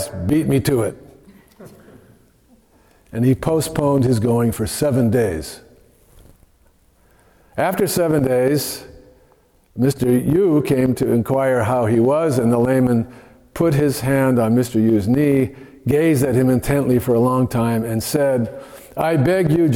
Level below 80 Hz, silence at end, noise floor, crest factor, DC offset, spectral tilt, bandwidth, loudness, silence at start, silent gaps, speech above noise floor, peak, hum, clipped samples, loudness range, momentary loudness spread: -44 dBFS; 0 s; -55 dBFS; 12 dB; under 0.1%; -7 dB/octave; 18 kHz; -18 LUFS; 0 s; none; 39 dB; -6 dBFS; none; under 0.1%; 6 LU; 7 LU